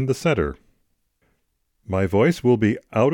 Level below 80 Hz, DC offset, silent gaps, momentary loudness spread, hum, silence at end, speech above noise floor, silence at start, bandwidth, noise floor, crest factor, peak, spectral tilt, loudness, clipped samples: -44 dBFS; under 0.1%; none; 8 LU; none; 0 s; 50 dB; 0 s; 18 kHz; -70 dBFS; 16 dB; -6 dBFS; -7 dB/octave; -21 LUFS; under 0.1%